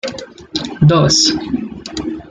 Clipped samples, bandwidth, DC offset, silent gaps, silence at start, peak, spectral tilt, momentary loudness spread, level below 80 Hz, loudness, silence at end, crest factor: under 0.1%; 9.4 kHz; under 0.1%; none; 0.05 s; -2 dBFS; -4.5 dB/octave; 16 LU; -42 dBFS; -14 LUFS; 0.1 s; 14 dB